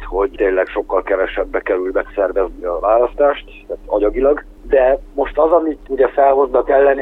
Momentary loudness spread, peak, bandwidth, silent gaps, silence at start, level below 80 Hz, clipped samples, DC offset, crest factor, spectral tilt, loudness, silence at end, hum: 8 LU; -2 dBFS; 4 kHz; none; 0 s; -36 dBFS; under 0.1%; under 0.1%; 14 dB; -7.5 dB/octave; -16 LUFS; 0 s; none